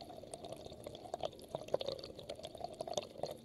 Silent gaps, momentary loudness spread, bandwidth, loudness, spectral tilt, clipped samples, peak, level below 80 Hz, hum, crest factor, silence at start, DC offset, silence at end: none; 9 LU; 15.5 kHz; -45 LUFS; -4 dB/octave; under 0.1%; -18 dBFS; -68 dBFS; none; 28 dB; 0 s; under 0.1%; 0 s